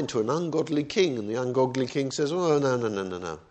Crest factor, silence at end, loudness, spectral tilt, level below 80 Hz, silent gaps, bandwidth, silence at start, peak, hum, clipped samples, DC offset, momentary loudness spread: 16 dB; 0.1 s; -27 LUFS; -5.5 dB/octave; -64 dBFS; none; 8.8 kHz; 0 s; -10 dBFS; none; under 0.1%; under 0.1%; 6 LU